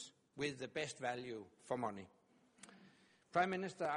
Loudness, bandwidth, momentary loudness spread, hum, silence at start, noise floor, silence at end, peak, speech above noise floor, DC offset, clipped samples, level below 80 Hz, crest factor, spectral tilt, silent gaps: -43 LUFS; 11.5 kHz; 22 LU; none; 0 s; -68 dBFS; 0 s; -22 dBFS; 27 dB; under 0.1%; under 0.1%; -80 dBFS; 22 dB; -4.5 dB/octave; none